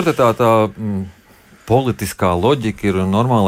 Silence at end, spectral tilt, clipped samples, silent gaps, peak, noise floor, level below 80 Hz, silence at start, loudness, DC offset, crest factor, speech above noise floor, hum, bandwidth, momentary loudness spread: 0 s; -6.5 dB/octave; under 0.1%; none; -2 dBFS; -44 dBFS; -44 dBFS; 0 s; -17 LUFS; under 0.1%; 14 dB; 28 dB; none; 16.5 kHz; 10 LU